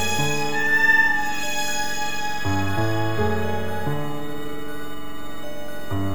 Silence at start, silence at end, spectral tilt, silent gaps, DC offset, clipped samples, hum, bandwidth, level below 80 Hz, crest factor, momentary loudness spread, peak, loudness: 0 s; 0 s; -4 dB/octave; none; 7%; under 0.1%; none; over 20 kHz; -46 dBFS; 16 dB; 18 LU; -6 dBFS; -23 LUFS